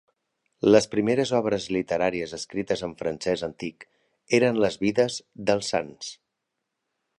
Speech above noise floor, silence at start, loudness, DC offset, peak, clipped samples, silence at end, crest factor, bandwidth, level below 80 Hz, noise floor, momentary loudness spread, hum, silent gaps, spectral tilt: 57 dB; 0.65 s; -25 LUFS; under 0.1%; -4 dBFS; under 0.1%; 1.05 s; 22 dB; 11 kHz; -60 dBFS; -82 dBFS; 13 LU; none; none; -5 dB/octave